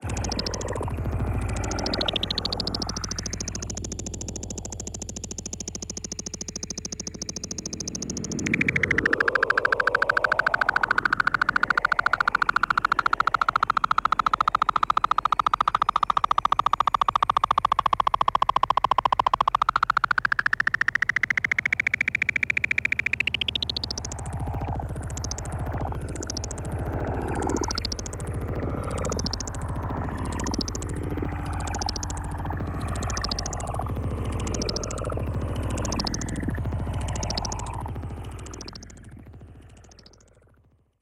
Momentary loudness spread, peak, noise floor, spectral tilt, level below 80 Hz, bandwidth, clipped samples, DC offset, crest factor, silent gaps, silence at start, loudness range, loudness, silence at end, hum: 11 LU; -8 dBFS; -61 dBFS; -3.5 dB/octave; -38 dBFS; 16 kHz; under 0.1%; under 0.1%; 20 dB; none; 0 s; 10 LU; -25 LUFS; 1.1 s; none